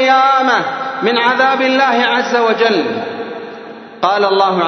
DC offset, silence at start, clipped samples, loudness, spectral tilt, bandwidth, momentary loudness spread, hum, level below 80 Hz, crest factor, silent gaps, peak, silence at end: under 0.1%; 0 s; under 0.1%; -13 LUFS; -4 dB/octave; 6.4 kHz; 15 LU; none; -68 dBFS; 14 dB; none; 0 dBFS; 0 s